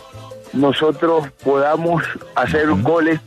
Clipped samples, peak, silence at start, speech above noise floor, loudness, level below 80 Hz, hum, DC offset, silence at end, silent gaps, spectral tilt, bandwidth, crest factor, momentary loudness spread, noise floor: under 0.1%; -2 dBFS; 0 s; 20 dB; -17 LUFS; -48 dBFS; none; under 0.1%; 0.05 s; none; -7 dB/octave; 13.5 kHz; 14 dB; 7 LU; -36 dBFS